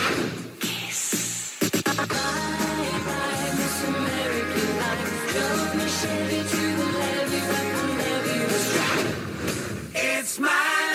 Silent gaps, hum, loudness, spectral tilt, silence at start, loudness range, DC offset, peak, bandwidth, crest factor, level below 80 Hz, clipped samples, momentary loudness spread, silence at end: none; none; -25 LUFS; -3 dB/octave; 0 s; 1 LU; under 0.1%; -10 dBFS; 17 kHz; 16 dB; -52 dBFS; under 0.1%; 6 LU; 0 s